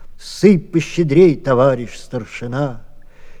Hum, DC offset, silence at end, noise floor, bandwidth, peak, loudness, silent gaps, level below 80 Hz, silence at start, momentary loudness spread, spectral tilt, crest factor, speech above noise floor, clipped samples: none; under 0.1%; 0 s; -34 dBFS; 12 kHz; 0 dBFS; -15 LUFS; none; -38 dBFS; 0 s; 15 LU; -7 dB/octave; 16 dB; 20 dB; under 0.1%